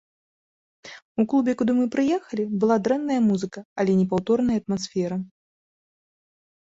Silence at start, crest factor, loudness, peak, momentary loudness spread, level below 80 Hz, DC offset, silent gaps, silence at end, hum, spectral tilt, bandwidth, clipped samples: 0.85 s; 16 dB; -23 LUFS; -8 dBFS; 11 LU; -60 dBFS; under 0.1%; 1.05-1.15 s, 3.65-3.76 s; 1.4 s; none; -7 dB/octave; 7.8 kHz; under 0.1%